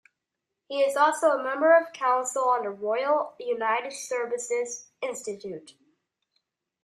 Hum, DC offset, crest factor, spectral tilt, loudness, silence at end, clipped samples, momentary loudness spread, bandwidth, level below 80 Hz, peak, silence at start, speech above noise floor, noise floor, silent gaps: none; under 0.1%; 18 dB; -2 dB/octave; -26 LUFS; 1.15 s; under 0.1%; 14 LU; 13.5 kHz; -82 dBFS; -8 dBFS; 0.7 s; 59 dB; -85 dBFS; none